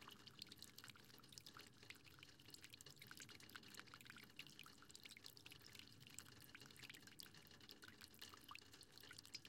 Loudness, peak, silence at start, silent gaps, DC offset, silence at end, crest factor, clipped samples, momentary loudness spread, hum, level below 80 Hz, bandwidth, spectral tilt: -60 LUFS; -34 dBFS; 0 s; none; under 0.1%; 0 s; 28 dB; under 0.1%; 3 LU; none; -86 dBFS; 16.5 kHz; -2 dB/octave